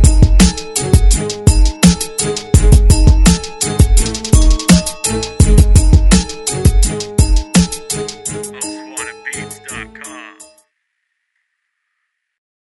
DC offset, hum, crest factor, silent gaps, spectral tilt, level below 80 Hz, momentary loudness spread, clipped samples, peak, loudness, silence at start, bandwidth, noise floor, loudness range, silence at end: under 0.1%; none; 12 dB; none; -5 dB/octave; -14 dBFS; 15 LU; 0.4%; 0 dBFS; -13 LUFS; 0 s; 12 kHz; -71 dBFS; 16 LU; 2.4 s